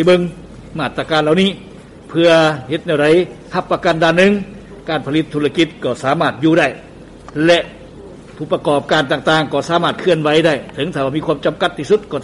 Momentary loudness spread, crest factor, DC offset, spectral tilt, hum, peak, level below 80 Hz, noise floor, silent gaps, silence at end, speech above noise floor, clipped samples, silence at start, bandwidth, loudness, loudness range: 12 LU; 14 dB; under 0.1%; -5.5 dB/octave; none; -2 dBFS; -46 dBFS; -35 dBFS; none; 0 s; 21 dB; under 0.1%; 0 s; 11.5 kHz; -15 LUFS; 2 LU